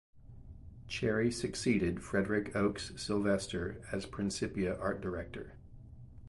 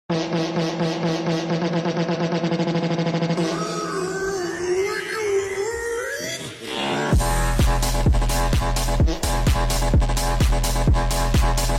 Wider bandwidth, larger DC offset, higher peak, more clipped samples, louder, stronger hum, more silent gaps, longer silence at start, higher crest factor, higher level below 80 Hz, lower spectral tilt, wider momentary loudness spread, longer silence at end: second, 11.5 kHz vs 16.5 kHz; neither; second, -18 dBFS vs -10 dBFS; neither; second, -35 LUFS vs -22 LUFS; neither; neither; about the same, 0.15 s vs 0.1 s; first, 18 dB vs 12 dB; second, -54 dBFS vs -24 dBFS; about the same, -5.5 dB/octave vs -5 dB/octave; first, 22 LU vs 5 LU; about the same, 0 s vs 0 s